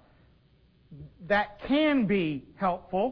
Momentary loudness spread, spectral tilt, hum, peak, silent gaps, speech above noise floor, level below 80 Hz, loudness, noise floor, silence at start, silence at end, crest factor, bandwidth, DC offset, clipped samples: 7 LU; -8.5 dB/octave; none; -12 dBFS; none; 34 dB; -56 dBFS; -27 LUFS; -62 dBFS; 0.9 s; 0 s; 16 dB; 5.4 kHz; under 0.1%; under 0.1%